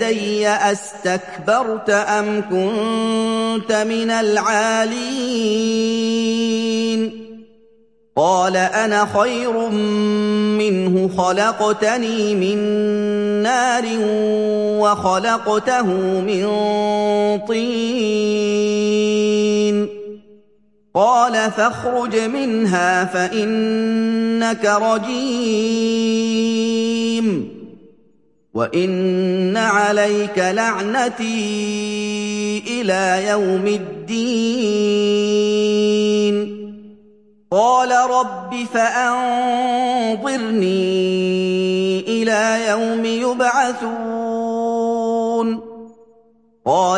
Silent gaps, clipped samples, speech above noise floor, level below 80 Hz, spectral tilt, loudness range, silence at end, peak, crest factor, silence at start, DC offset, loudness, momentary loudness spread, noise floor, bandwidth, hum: none; under 0.1%; 41 dB; -62 dBFS; -4.5 dB/octave; 2 LU; 0 s; -2 dBFS; 16 dB; 0 s; 0.1%; -18 LUFS; 6 LU; -58 dBFS; 11.5 kHz; none